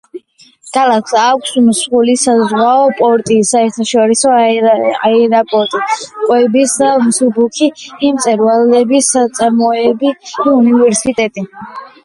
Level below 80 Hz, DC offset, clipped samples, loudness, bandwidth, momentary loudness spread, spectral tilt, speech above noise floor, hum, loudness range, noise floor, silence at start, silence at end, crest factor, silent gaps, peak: -56 dBFS; under 0.1%; under 0.1%; -11 LUFS; 11.5 kHz; 7 LU; -3.5 dB/octave; 32 dB; none; 1 LU; -42 dBFS; 0.15 s; 0.15 s; 10 dB; none; 0 dBFS